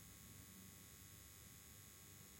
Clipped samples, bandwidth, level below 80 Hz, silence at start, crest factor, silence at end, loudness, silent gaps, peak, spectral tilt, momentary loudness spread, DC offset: under 0.1%; 16.5 kHz; -74 dBFS; 0 s; 16 dB; 0 s; -59 LUFS; none; -46 dBFS; -3 dB/octave; 1 LU; under 0.1%